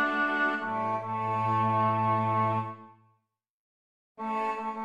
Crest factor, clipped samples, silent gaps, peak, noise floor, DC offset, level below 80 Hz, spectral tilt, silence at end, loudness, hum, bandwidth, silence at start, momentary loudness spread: 14 dB; under 0.1%; 3.50-4.15 s; -14 dBFS; -78 dBFS; under 0.1%; -70 dBFS; -7.5 dB/octave; 0 s; -28 LUFS; none; 9 kHz; 0 s; 8 LU